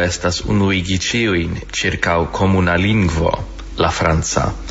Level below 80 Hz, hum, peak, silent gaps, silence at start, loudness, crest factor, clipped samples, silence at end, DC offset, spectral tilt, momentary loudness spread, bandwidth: -30 dBFS; none; 0 dBFS; none; 0 s; -17 LUFS; 16 dB; under 0.1%; 0 s; under 0.1%; -5 dB/octave; 5 LU; 8 kHz